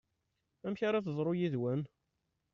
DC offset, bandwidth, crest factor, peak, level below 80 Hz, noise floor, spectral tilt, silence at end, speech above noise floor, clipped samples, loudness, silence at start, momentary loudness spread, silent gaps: under 0.1%; 6.8 kHz; 14 dB; -22 dBFS; -76 dBFS; -83 dBFS; -7 dB/octave; 0.65 s; 49 dB; under 0.1%; -36 LUFS; 0.65 s; 10 LU; none